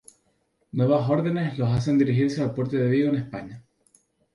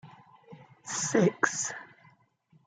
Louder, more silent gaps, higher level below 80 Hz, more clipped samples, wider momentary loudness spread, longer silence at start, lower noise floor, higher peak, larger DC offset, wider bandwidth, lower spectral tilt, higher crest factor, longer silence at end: first, -24 LUFS vs -28 LUFS; neither; first, -58 dBFS vs -78 dBFS; neither; second, 12 LU vs 17 LU; first, 0.75 s vs 0.05 s; about the same, -69 dBFS vs -66 dBFS; about the same, -8 dBFS vs -8 dBFS; neither; first, 11.5 kHz vs 9.6 kHz; first, -8.5 dB/octave vs -4 dB/octave; second, 16 dB vs 24 dB; about the same, 0.75 s vs 0.8 s